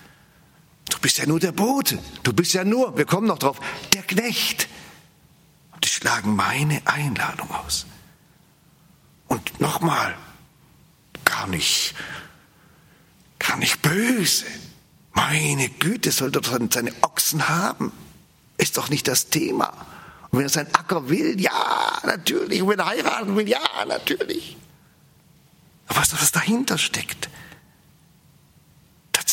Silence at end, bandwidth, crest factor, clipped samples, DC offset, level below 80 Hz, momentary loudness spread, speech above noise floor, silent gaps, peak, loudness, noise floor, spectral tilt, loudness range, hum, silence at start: 0 s; 16.5 kHz; 24 dB; under 0.1%; under 0.1%; -56 dBFS; 9 LU; 34 dB; none; 0 dBFS; -21 LUFS; -56 dBFS; -3 dB/octave; 5 LU; none; 0.85 s